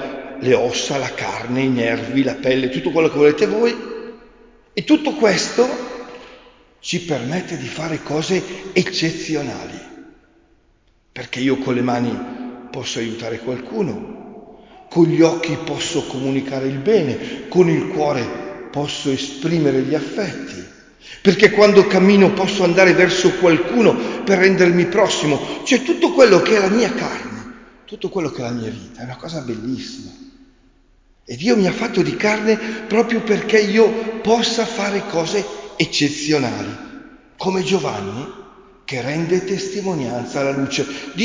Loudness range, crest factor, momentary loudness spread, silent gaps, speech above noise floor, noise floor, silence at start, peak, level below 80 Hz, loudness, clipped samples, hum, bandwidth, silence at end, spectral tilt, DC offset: 10 LU; 18 dB; 17 LU; none; 40 dB; -57 dBFS; 0 s; 0 dBFS; -52 dBFS; -18 LUFS; under 0.1%; none; 7.6 kHz; 0 s; -5 dB/octave; under 0.1%